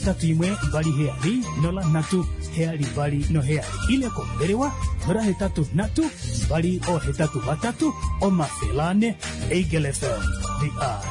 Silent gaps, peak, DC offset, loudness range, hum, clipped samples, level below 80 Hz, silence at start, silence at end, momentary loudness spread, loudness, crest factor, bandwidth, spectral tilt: none; -10 dBFS; under 0.1%; 1 LU; none; under 0.1%; -34 dBFS; 0 s; 0 s; 4 LU; -24 LUFS; 12 dB; 11 kHz; -6 dB/octave